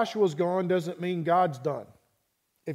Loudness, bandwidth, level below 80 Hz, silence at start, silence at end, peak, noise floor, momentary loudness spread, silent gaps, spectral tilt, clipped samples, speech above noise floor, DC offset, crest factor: -27 LUFS; 15 kHz; -78 dBFS; 0 s; 0 s; -12 dBFS; -75 dBFS; 10 LU; none; -7 dB/octave; under 0.1%; 48 dB; under 0.1%; 16 dB